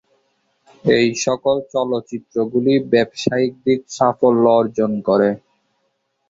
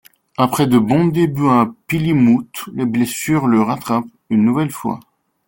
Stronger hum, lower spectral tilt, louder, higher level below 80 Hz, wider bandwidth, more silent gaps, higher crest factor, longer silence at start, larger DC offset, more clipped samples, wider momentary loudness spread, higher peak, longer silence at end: neither; about the same, -5.5 dB/octave vs -6.5 dB/octave; about the same, -18 LUFS vs -16 LUFS; second, -58 dBFS vs -52 dBFS; second, 7.8 kHz vs 17 kHz; neither; about the same, 16 dB vs 14 dB; first, 0.85 s vs 0.4 s; neither; neither; about the same, 8 LU vs 9 LU; about the same, -2 dBFS vs -2 dBFS; first, 0.9 s vs 0.5 s